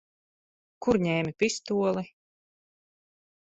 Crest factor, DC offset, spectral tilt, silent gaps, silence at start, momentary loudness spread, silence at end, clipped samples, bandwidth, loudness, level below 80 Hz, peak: 20 dB; under 0.1%; -5 dB/octave; none; 0.8 s; 8 LU; 1.35 s; under 0.1%; 8.4 kHz; -28 LUFS; -62 dBFS; -10 dBFS